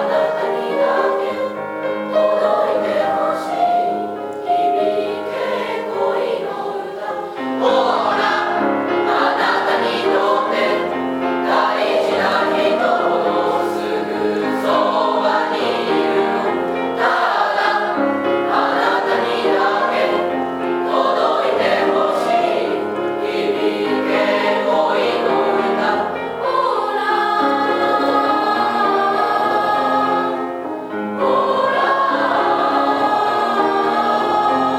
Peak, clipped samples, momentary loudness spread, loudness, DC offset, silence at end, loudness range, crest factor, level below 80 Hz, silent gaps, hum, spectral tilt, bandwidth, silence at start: -2 dBFS; under 0.1%; 5 LU; -17 LUFS; under 0.1%; 0 s; 2 LU; 14 dB; -66 dBFS; none; none; -5 dB/octave; 15.5 kHz; 0 s